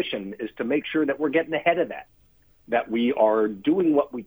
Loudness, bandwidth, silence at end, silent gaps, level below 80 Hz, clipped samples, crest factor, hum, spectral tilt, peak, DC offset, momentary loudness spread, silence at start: -24 LUFS; over 20 kHz; 0 s; none; -64 dBFS; under 0.1%; 18 dB; none; -8 dB/octave; -6 dBFS; under 0.1%; 10 LU; 0 s